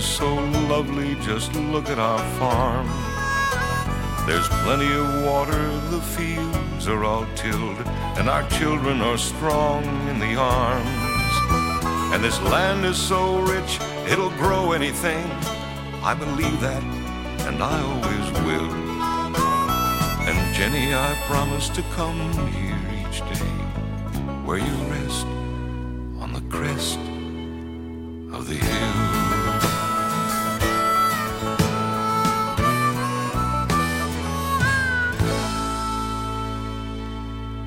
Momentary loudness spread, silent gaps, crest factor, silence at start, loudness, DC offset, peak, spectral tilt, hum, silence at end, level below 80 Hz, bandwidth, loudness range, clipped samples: 9 LU; none; 20 dB; 0 s; -23 LUFS; under 0.1%; -4 dBFS; -4.5 dB/octave; none; 0 s; -32 dBFS; 16.5 kHz; 6 LU; under 0.1%